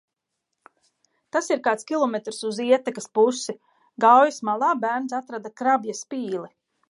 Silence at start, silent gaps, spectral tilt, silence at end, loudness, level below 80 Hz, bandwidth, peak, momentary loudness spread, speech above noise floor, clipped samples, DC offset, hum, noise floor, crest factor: 1.35 s; none; -3.5 dB/octave; 0.45 s; -23 LUFS; -82 dBFS; 11.5 kHz; -4 dBFS; 14 LU; 59 dB; under 0.1%; under 0.1%; none; -81 dBFS; 20 dB